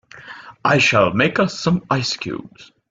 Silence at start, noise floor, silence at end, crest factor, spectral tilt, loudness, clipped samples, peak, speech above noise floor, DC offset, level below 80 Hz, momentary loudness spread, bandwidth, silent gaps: 0.15 s; -39 dBFS; 0.25 s; 18 dB; -5 dB/octave; -18 LUFS; under 0.1%; -2 dBFS; 21 dB; under 0.1%; -54 dBFS; 21 LU; 7.8 kHz; none